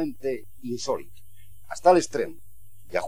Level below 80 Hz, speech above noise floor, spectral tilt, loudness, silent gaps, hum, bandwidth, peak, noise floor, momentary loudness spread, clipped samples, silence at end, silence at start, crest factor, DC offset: -58 dBFS; 27 dB; -4.5 dB/octave; -26 LUFS; none; none; 16.5 kHz; -6 dBFS; -52 dBFS; 15 LU; under 0.1%; 0 s; 0 s; 20 dB; 1%